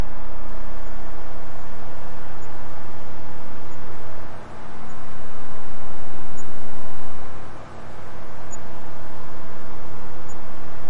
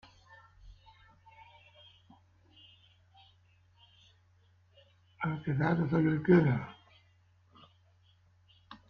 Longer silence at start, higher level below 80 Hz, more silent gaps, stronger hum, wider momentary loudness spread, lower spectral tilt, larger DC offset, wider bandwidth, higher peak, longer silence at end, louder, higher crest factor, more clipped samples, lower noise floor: second, 0 s vs 0.65 s; first, -44 dBFS vs -64 dBFS; neither; neither; second, 1 LU vs 15 LU; second, -6 dB/octave vs -10 dB/octave; neither; first, 11.5 kHz vs 5.6 kHz; first, -6 dBFS vs -12 dBFS; second, 0 s vs 0.15 s; second, -39 LUFS vs -30 LUFS; second, 6 dB vs 24 dB; neither; second, -39 dBFS vs -66 dBFS